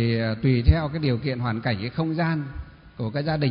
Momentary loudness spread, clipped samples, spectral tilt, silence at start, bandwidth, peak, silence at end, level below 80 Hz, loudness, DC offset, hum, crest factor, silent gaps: 12 LU; under 0.1%; -12 dB/octave; 0 s; 5.4 kHz; -4 dBFS; 0 s; -32 dBFS; -25 LUFS; under 0.1%; none; 20 dB; none